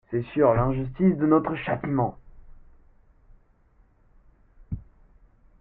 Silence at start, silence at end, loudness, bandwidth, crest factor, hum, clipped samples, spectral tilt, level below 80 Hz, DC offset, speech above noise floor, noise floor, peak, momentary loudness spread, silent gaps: 0.1 s; 0.8 s; -24 LUFS; 4 kHz; 20 dB; none; under 0.1%; -12.5 dB/octave; -46 dBFS; under 0.1%; 37 dB; -60 dBFS; -8 dBFS; 18 LU; none